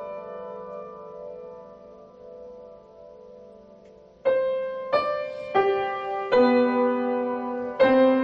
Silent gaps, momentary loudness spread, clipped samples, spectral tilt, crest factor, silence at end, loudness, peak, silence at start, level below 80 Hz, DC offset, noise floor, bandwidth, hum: none; 24 LU; under 0.1%; -7 dB/octave; 18 dB; 0 s; -24 LUFS; -8 dBFS; 0 s; -64 dBFS; under 0.1%; -50 dBFS; 5.8 kHz; none